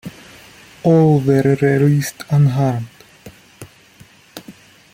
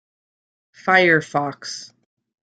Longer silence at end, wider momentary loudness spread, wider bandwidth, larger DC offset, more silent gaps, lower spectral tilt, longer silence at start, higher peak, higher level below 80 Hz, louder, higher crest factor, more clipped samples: second, 0.4 s vs 0.6 s; first, 24 LU vs 17 LU; first, 16 kHz vs 9.2 kHz; neither; neither; first, -7.5 dB/octave vs -4.5 dB/octave; second, 0.05 s vs 0.85 s; about the same, -2 dBFS vs -2 dBFS; first, -52 dBFS vs -68 dBFS; first, -15 LUFS vs -18 LUFS; about the same, 16 dB vs 20 dB; neither